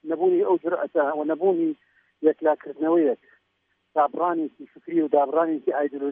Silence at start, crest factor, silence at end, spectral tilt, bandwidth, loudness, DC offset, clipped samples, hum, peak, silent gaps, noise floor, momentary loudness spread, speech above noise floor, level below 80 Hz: 0.05 s; 16 dB; 0 s; -5.5 dB/octave; 3.6 kHz; -24 LUFS; under 0.1%; under 0.1%; none; -8 dBFS; none; -72 dBFS; 8 LU; 50 dB; -84 dBFS